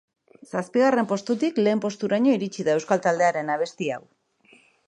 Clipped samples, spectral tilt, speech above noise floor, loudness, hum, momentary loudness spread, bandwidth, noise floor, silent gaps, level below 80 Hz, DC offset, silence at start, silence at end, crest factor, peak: under 0.1%; -5.5 dB/octave; 35 dB; -23 LUFS; none; 10 LU; 11 kHz; -58 dBFS; none; -76 dBFS; under 0.1%; 0.55 s; 0.9 s; 18 dB; -6 dBFS